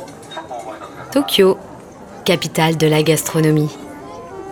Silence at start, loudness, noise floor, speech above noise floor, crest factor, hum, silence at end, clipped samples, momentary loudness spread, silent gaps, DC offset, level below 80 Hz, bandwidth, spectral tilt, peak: 0 s; -16 LUFS; -36 dBFS; 21 dB; 18 dB; none; 0 s; under 0.1%; 19 LU; none; under 0.1%; -52 dBFS; 18 kHz; -5 dB/octave; 0 dBFS